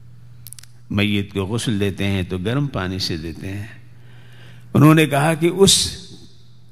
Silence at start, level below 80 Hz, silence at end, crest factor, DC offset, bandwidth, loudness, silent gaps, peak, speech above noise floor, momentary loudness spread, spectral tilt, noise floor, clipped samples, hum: 0.45 s; -46 dBFS; 0.55 s; 20 dB; 0.8%; 16 kHz; -18 LUFS; none; 0 dBFS; 29 dB; 20 LU; -4.5 dB/octave; -47 dBFS; under 0.1%; none